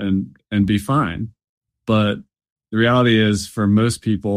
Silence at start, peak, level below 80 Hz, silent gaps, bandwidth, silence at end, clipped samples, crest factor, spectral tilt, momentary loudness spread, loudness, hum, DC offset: 0 s; -4 dBFS; -46 dBFS; 1.49-1.61 s, 2.52-2.56 s; 14.5 kHz; 0 s; under 0.1%; 14 dB; -6 dB/octave; 13 LU; -18 LUFS; none; under 0.1%